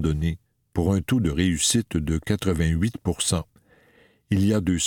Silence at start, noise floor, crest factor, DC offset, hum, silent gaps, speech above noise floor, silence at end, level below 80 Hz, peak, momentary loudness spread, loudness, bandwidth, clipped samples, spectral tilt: 0 s; -58 dBFS; 18 dB; under 0.1%; none; none; 36 dB; 0 s; -38 dBFS; -6 dBFS; 8 LU; -24 LUFS; 18.5 kHz; under 0.1%; -5 dB/octave